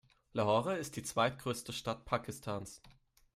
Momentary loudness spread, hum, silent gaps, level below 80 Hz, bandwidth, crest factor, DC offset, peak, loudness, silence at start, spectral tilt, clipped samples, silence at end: 11 LU; none; none; -64 dBFS; 15.5 kHz; 20 dB; under 0.1%; -18 dBFS; -37 LUFS; 0.35 s; -4.5 dB/octave; under 0.1%; 0.45 s